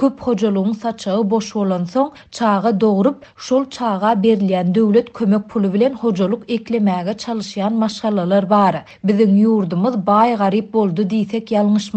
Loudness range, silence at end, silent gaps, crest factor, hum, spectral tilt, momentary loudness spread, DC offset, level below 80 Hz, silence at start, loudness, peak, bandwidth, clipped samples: 3 LU; 0 s; none; 16 dB; none; -7 dB/octave; 7 LU; under 0.1%; -58 dBFS; 0 s; -17 LUFS; 0 dBFS; 8.4 kHz; under 0.1%